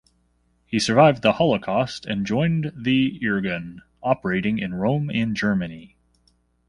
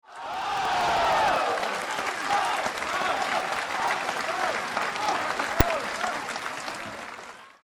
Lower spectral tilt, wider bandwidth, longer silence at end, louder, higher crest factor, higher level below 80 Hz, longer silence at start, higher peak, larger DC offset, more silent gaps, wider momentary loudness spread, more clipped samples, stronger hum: first, -6 dB/octave vs -3 dB/octave; second, 11.5 kHz vs 19.5 kHz; first, 0.85 s vs 0.15 s; first, -22 LUFS vs -27 LUFS; about the same, 20 dB vs 22 dB; second, -52 dBFS vs -44 dBFS; first, 0.7 s vs 0.1 s; about the same, -4 dBFS vs -6 dBFS; neither; neither; about the same, 11 LU vs 11 LU; neither; first, 60 Hz at -50 dBFS vs none